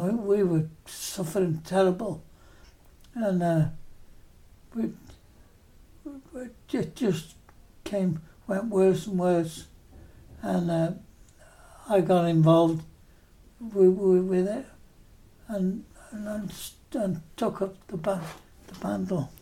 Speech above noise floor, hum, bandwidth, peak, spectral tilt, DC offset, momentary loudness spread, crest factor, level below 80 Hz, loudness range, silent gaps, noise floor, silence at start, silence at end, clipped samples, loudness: 29 dB; none; 16 kHz; -8 dBFS; -7 dB/octave; under 0.1%; 20 LU; 20 dB; -56 dBFS; 9 LU; none; -55 dBFS; 0 s; 0.05 s; under 0.1%; -27 LUFS